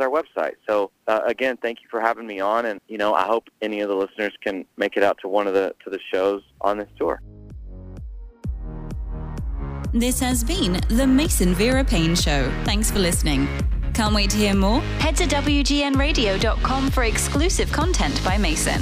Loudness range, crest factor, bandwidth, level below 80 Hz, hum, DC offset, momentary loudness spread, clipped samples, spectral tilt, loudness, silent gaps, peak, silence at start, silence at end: 8 LU; 18 dB; 16 kHz; -28 dBFS; none; under 0.1%; 13 LU; under 0.1%; -4.5 dB/octave; -22 LUFS; none; -2 dBFS; 0 s; 0 s